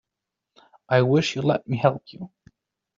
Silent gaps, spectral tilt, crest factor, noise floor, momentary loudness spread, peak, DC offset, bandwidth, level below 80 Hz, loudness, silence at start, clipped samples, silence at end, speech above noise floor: none; -5.5 dB/octave; 22 dB; -85 dBFS; 21 LU; -4 dBFS; under 0.1%; 7.6 kHz; -62 dBFS; -22 LUFS; 0.9 s; under 0.1%; 0.7 s; 63 dB